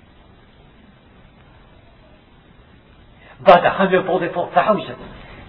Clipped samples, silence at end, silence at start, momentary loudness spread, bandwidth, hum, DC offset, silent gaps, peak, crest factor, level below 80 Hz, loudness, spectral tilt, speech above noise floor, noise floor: under 0.1%; 0.05 s; 3.4 s; 21 LU; 5.4 kHz; none; under 0.1%; none; 0 dBFS; 20 dB; -50 dBFS; -16 LUFS; -8 dB/octave; 32 dB; -48 dBFS